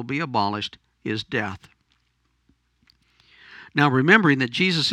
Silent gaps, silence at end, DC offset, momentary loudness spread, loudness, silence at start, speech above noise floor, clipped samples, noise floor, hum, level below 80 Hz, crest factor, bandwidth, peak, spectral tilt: none; 0 s; under 0.1%; 17 LU; -21 LUFS; 0 s; 47 dB; under 0.1%; -69 dBFS; none; -64 dBFS; 24 dB; 12 kHz; 0 dBFS; -5.5 dB/octave